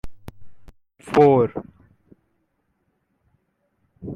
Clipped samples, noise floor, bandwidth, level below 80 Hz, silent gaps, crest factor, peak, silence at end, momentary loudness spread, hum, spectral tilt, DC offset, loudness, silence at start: under 0.1%; -71 dBFS; 10.5 kHz; -50 dBFS; none; 22 dB; -4 dBFS; 0 s; 25 LU; none; -8 dB/octave; under 0.1%; -18 LUFS; 0.05 s